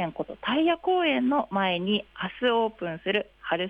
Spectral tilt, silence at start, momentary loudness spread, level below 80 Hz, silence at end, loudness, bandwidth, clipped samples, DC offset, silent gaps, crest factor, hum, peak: -7.5 dB/octave; 0 s; 8 LU; -62 dBFS; 0 s; -26 LUFS; 5.2 kHz; under 0.1%; under 0.1%; none; 14 dB; none; -12 dBFS